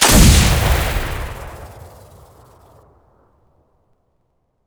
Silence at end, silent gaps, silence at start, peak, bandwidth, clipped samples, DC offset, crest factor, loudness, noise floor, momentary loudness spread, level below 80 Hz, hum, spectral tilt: 2.8 s; none; 0 s; 0 dBFS; over 20 kHz; under 0.1%; under 0.1%; 18 dB; -14 LUFS; -66 dBFS; 26 LU; -22 dBFS; none; -3.5 dB/octave